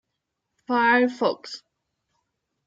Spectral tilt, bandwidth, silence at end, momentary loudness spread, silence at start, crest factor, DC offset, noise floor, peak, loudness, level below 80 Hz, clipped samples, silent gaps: -4.5 dB/octave; 7.8 kHz; 1.1 s; 19 LU; 0.7 s; 20 dB; under 0.1%; -81 dBFS; -6 dBFS; -22 LUFS; -82 dBFS; under 0.1%; none